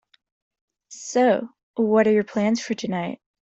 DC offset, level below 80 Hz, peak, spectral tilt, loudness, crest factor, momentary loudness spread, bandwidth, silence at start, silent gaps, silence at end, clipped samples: under 0.1%; -68 dBFS; -6 dBFS; -5.5 dB/octave; -22 LUFS; 18 dB; 13 LU; 8 kHz; 0.9 s; 1.63-1.74 s; 0.3 s; under 0.1%